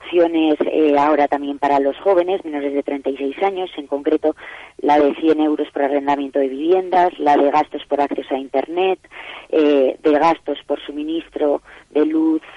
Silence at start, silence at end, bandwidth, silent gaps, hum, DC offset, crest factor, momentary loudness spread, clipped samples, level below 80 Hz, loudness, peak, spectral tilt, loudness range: 0 s; 0.05 s; 7.6 kHz; none; none; under 0.1%; 12 dB; 9 LU; under 0.1%; -58 dBFS; -18 LUFS; -6 dBFS; -6 dB/octave; 2 LU